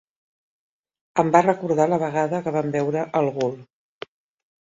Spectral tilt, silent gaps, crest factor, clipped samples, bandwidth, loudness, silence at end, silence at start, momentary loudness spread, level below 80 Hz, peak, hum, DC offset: -7 dB/octave; none; 22 dB; under 0.1%; 7.8 kHz; -22 LUFS; 1.1 s; 1.15 s; 23 LU; -66 dBFS; -2 dBFS; none; under 0.1%